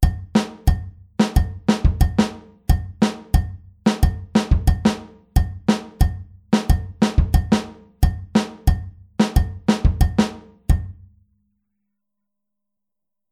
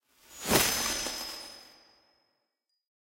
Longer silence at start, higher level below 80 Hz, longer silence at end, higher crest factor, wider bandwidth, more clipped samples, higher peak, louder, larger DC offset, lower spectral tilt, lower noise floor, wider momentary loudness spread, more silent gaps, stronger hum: second, 0 s vs 0.3 s; first, -24 dBFS vs -54 dBFS; first, 2.4 s vs 1.4 s; second, 18 dB vs 28 dB; about the same, 15.5 kHz vs 16.5 kHz; neither; first, -2 dBFS vs -8 dBFS; first, -21 LUFS vs -28 LUFS; neither; first, -6.5 dB/octave vs -1.5 dB/octave; first, -87 dBFS vs -82 dBFS; second, 7 LU vs 20 LU; neither; neither